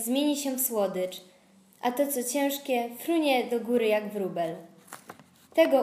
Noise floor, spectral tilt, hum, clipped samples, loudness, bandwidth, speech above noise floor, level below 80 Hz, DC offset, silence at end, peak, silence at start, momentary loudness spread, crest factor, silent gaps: -59 dBFS; -3.5 dB/octave; none; under 0.1%; -28 LUFS; 15.5 kHz; 31 dB; -82 dBFS; under 0.1%; 0 s; -8 dBFS; 0 s; 19 LU; 20 dB; none